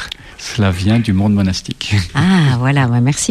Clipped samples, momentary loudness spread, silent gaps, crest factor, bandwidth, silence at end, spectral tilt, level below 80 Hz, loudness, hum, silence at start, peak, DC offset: under 0.1%; 9 LU; none; 12 dB; 13.5 kHz; 0 s; -5.5 dB/octave; -38 dBFS; -14 LUFS; none; 0 s; -2 dBFS; under 0.1%